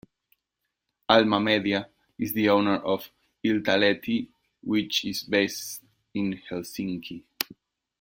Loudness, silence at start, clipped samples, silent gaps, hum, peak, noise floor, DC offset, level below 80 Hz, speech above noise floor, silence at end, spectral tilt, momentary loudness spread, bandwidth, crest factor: -26 LUFS; 1.1 s; under 0.1%; none; none; 0 dBFS; -82 dBFS; under 0.1%; -64 dBFS; 57 dB; 0.5 s; -4.5 dB/octave; 16 LU; 16.5 kHz; 26 dB